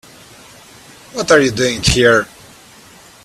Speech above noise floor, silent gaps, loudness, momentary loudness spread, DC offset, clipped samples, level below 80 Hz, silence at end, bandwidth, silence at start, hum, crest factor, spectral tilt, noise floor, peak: 29 dB; none; -13 LUFS; 15 LU; under 0.1%; under 0.1%; -36 dBFS; 1 s; 14.5 kHz; 1.15 s; none; 16 dB; -3.5 dB/octave; -42 dBFS; 0 dBFS